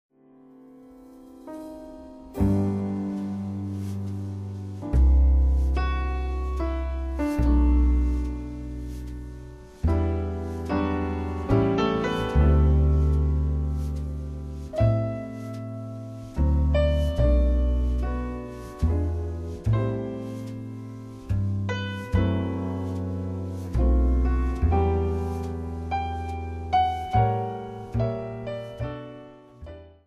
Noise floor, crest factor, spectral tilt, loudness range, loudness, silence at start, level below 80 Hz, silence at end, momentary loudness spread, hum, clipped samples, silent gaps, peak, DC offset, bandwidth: -52 dBFS; 16 dB; -8.5 dB/octave; 6 LU; -26 LUFS; 0.7 s; -28 dBFS; 0.2 s; 15 LU; none; under 0.1%; none; -8 dBFS; under 0.1%; 6.8 kHz